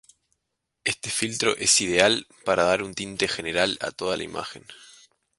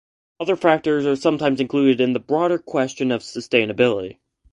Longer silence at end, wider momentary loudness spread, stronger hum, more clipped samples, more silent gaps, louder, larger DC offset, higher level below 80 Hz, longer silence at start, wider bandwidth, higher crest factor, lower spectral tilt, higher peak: first, 0.55 s vs 0.4 s; first, 12 LU vs 7 LU; neither; neither; neither; second, -23 LUFS vs -20 LUFS; neither; about the same, -58 dBFS vs -60 dBFS; first, 0.85 s vs 0.4 s; about the same, 11.5 kHz vs 10.5 kHz; first, 26 dB vs 18 dB; second, -2 dB/octave vs -5.5 dB/octave; about the same, 0 dBFS vs -2 dBFS